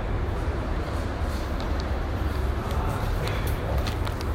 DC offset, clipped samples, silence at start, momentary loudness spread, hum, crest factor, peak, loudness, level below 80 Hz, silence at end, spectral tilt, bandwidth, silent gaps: under 0.1%; under 0.1%; 0 s; 2 LU; none; 14 dB; -12 dBFS; -29 LUFS; -30 dBFS; 0 s; -6.5 dB/octave; 16 kHz; none